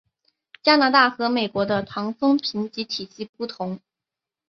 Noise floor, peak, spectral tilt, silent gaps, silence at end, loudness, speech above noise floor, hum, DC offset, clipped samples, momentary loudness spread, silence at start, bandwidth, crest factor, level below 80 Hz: -88 dBFS; -2 dBFS; -5 dB/octave; 3.29-3.33 s; 0.75 s; -22 LUFS; 66 dB; none; under 0.1%; under 0.1%; 16 LU; 0.65 s; 6.6 kHz; 20 dB; -64 dBFS